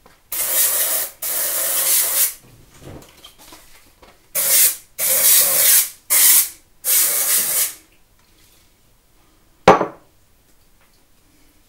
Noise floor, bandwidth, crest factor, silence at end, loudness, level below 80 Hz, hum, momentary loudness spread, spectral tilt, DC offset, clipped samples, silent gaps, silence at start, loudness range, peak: -55 dBFS; 16.5 kHz; 20 dB; 1.75 s; -14 LUFS; -52 dBFS; none; 11 LU; -0.5 dB/octave; under 0.1%; under 0.1%; none; 0.3 s; 10 LU; 0 dBFS